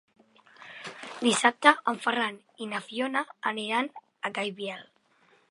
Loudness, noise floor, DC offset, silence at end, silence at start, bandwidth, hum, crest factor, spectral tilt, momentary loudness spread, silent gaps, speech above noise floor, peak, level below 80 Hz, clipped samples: -27 LUFS; -64 dBFS; under 0.1%; 0.65 s; 0.6 s; 11.5 kHz; none; 28 dB; -2.5 dB/octave; 19 LU; none; 36 dB; -2 dBFS; -84 dBFS; under 0.1%